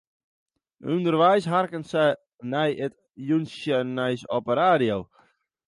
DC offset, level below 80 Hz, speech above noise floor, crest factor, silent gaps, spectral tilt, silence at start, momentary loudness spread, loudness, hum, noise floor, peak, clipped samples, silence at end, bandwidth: under 0.1%; -64 dBFS; 40 dB; 18 dB; none; -6.5 dB/octave; 0.85 s; 12 LU; -24 LUFS; none; -63 dBFS; -6 dBFS; under 0.1%; 0.65 s; 11.5 kHz